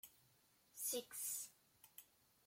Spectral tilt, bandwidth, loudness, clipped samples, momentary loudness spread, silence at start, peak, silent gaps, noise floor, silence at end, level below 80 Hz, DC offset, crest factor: 0 dB/octave; 16.5 kHz; -46 LUFS; under 0.1%; 18 LU; 0.05 s; -30 dBFS; none; -76 dBFS; 0.4 s; under -90 dBFS; under 0.1%; 22 dB